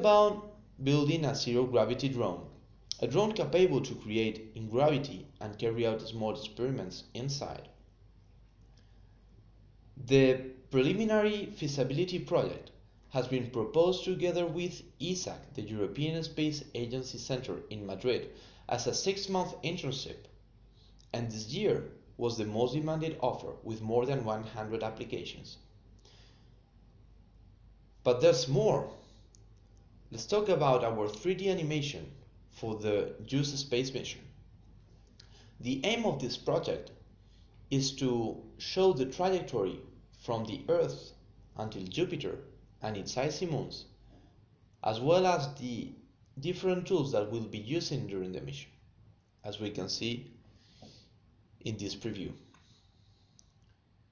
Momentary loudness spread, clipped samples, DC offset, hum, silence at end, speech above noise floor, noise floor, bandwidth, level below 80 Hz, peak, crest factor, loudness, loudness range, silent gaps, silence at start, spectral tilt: 15 LU; under 0.1%; under 0.1%; none; 1.75 s; 34 dB; -65 dBFS; 7.4 kHz; -60 dBFS; -10 dBFS; 22 dB; -33 LUFS; 9 LU; none; 0 s; -5.5 dB/octave